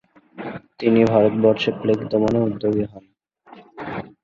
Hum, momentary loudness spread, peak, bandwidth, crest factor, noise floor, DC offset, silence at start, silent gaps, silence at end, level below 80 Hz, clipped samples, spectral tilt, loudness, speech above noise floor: none; 18 LU; -2 dBFS; 7.2 kHz; 18 dB; -48 dBFS; under 0.1%; 0.35 s; none; 0.2 s; -54 dBFS; under 0.1%; -8 dB/octave; -19 LUFS; 29 dB